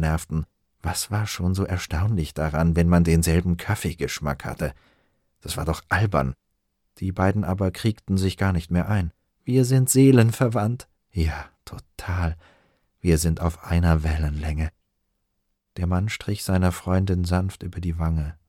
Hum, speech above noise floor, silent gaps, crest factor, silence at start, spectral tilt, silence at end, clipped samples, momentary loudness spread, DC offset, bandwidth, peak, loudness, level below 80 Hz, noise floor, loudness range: none; 52 dB; none; 20 dB; 0 s; -6 dB/octave; 0.15 s; under 0.1%; 13 LU; under 0.1%; 16.5 kHz; -4 dBFS; -23 LUFS; -34 dBFS; -75 dBFS; 6 LU